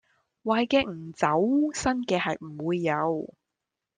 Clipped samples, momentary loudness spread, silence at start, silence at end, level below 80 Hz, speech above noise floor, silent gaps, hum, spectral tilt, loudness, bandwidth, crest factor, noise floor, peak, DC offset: under 0.1%; 10 LU; 0.45 s; 0.7 s; -58 dBFS; 60 dB; none; none; -5 dB/octave; -27 LUFS; 9.8 kHz; 18 dB; -86 dBFS; -10 dBFS; under 0.1%